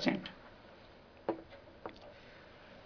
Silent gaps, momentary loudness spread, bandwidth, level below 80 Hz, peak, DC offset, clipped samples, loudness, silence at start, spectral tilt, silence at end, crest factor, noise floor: none; 15 LU; 5.4 kHz; -66 dBFS; -16 dBFS; under 0.1%; under 0.1%; -45 LUFS; 0 s; -3.5 dB/octave; 0 s; 28 dB; -58 dBFS